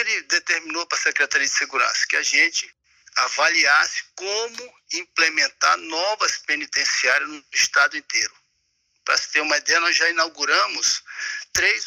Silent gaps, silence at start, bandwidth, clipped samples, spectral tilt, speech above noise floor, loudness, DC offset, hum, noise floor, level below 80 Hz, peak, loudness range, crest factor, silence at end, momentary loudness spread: none; 0 s; 16 kHz; under 0.1%; 1.5 dB/octave; 48 dB; -20 LUFS; under 0.1%; none; -70 dBFS; -64 dBFS; -6 dBFS; 2 LU; 16 dB; 0 s; 10 LU